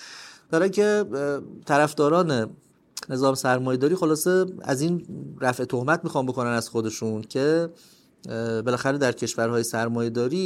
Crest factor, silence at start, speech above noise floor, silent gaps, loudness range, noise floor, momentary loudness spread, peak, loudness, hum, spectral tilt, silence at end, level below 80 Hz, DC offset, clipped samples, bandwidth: 18 dB; 0 s; 20 dB; none; 3 LU; -44 dBFS; 10 LU; -6 dBFS; -24 LUFS; none; -5 dB/octave; 0 s; -68 dBFS; under 0.1%; under 0.1%; 16.5 kHz